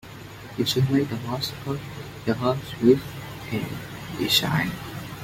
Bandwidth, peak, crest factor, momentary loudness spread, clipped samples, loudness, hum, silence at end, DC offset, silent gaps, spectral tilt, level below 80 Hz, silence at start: 16.5 kHz; -4 dBFS; 22 dB; 16 LU; under 0.1%; -25 LUFS; none; 0 s; under 0.1%; none; -5 dB/octave; -52 dBFS; 0.05 s